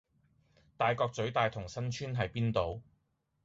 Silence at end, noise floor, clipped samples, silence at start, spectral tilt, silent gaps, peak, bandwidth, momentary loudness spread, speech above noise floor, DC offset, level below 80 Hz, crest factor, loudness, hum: 0.65 s; -78 dBFS; under 0.1%; 0.8 s; -5 dB/octave; none; -16 dBFS; 7.8 kHz; 8 LU; 45 dB; under 0.1%; -58 dBFS; 20 dB; -34 LUFS; none